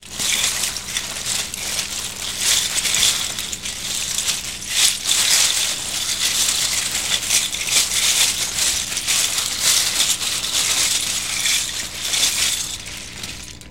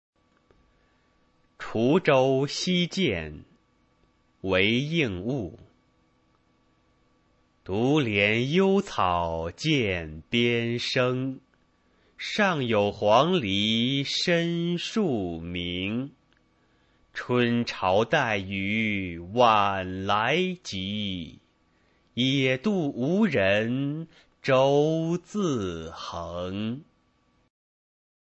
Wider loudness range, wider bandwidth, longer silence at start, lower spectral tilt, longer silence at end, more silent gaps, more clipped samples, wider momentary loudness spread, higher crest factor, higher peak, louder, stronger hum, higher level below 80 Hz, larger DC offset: about the same, 3 LU vs 5 LU; first, 17 kHz vs 8.4 kHz; second, 0 s vs 1.6 s; second, 1 dB/octave vs -5.5 dB/octave; second, 0 s vs 1.4 s; neither; neither; second, 9 LU vs 13 LU; about the same, 20 dB vs 22 dB; first, 0 dBFS vs -6 dBFS; first, -17 LUFS vs -25 LUFS; first, 60 Hz at -45 dBFS vs none; first, -46 dBFS vs -56 dBFS; first, 0.5% vs under 0.1%